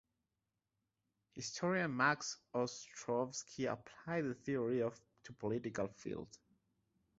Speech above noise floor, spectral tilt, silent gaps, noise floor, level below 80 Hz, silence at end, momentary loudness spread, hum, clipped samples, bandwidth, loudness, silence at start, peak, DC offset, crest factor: 49 dB; -4.5 dB/octave; none; -89 dBFS; -76 dBFS; 0.9 s; 13 LU; none; under 0.1%; 8 kHz; -40 LUFS; 1.35 s; -20 dBFS; under 0.1%; 22 dB